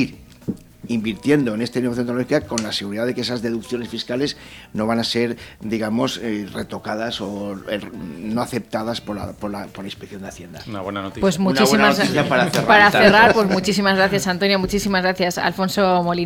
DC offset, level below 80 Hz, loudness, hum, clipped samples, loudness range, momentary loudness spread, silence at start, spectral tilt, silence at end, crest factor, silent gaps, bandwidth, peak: under 0.1%; -48 dBFS; -19 LUFS; none; under 0.1%; 12 LU; 17 LU; 0 s; -4.5 dB/octave; 0 s; 18 dB; none; 18.5 kHz; 0 dBFS